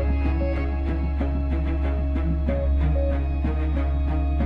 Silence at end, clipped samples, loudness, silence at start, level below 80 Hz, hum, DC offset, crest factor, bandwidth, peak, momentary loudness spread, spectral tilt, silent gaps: 0 s; under 0.1%; -25 LUFS; 0 s; -24 dBFS; none; under 0.1%; 10 dB; 4.4 kHz; -12 dBFS; 3 LU; -10 dB/octave; none